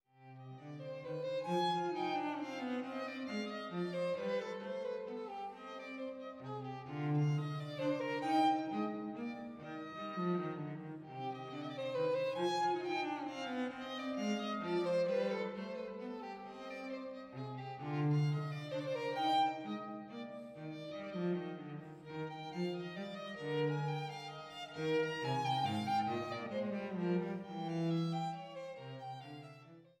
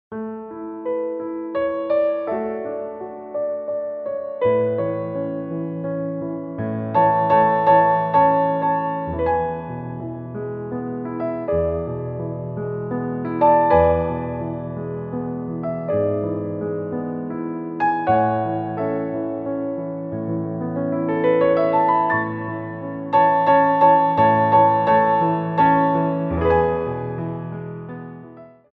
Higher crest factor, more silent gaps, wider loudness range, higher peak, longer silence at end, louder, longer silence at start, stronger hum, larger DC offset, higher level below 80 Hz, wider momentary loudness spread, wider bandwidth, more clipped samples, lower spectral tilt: about the same, 18 dB vs 16 dB; neither; second, 4 LU vs 8 LU; second, -22 dBFS vs -4 dBFS; second, 0.1 s vs 0.25 s; second, -39 LUFS vs -21 LUFS; about the same, 0.2 s vs 0.1 s; neither; neither; second, -82 dBFS vs -46 dBFS; about the same, 13 LU vs 14 LU; first, 11.5 kHz vs 5 kHz; neither; second, -6.5 dB/octave vs -10.5 dB/octave